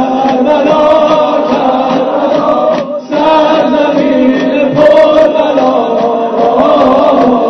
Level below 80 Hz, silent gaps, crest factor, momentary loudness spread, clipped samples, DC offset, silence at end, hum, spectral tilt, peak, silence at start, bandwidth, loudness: -44 dBFS; none; 8 dB; 5 LU; 1%; under 0.1%; 0 s; none; -6.5 dB/octave; 0 dBFS; 0 s; 6.4 kHz; -8 LUFS